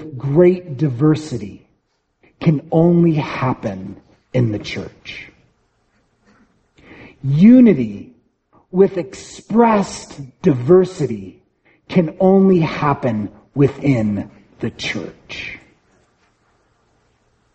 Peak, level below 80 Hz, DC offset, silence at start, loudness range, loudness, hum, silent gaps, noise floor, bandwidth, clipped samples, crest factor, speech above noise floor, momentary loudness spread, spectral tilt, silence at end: 0 dBFS; -50 dBFS; under 0.1%; 0 s; 11 LU; -16 LUFS; none; none; -66 dBFS; 8.4 kHz; under 0.1%; 18 dB; 51 dB; 18 LU; -8 dB/octave; 2 s